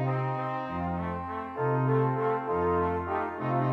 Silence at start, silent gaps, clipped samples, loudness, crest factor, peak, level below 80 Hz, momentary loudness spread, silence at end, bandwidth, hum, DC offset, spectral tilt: 0 s; none; under 0.1%; -29 LUFS; 14 dB; -14 dBFS; -54 dBFS; 7 LU; 0 s; 4.6 kHz; none; under 0.1%; -10 dB/octave